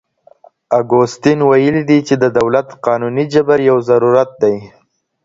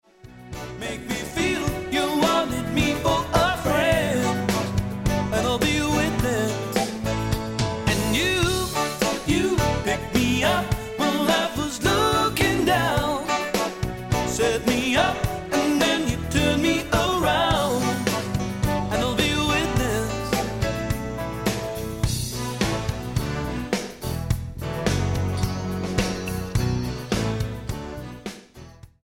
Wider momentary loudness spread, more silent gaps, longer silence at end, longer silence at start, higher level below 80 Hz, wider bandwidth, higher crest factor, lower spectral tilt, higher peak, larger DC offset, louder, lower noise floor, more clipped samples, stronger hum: about the same, 6 LU vs 8 LU; neither; first, 0.55 s vs 0.15 s; first, 0.7 s vs 0.25 s; second, -54 dBFS vs -36 dBFS; second, 7.8 kHz vs 17 kHz; about the same, 14 dB vs 18 dB; first, -7 dB/octave vs -4.5 dB/octave; first, 0 dBFS vs -4 dBFS; neither; first, -13 LUFS vs -23 LUFS; about the same, -46 dBFS vs -45 dBFS; neither; neither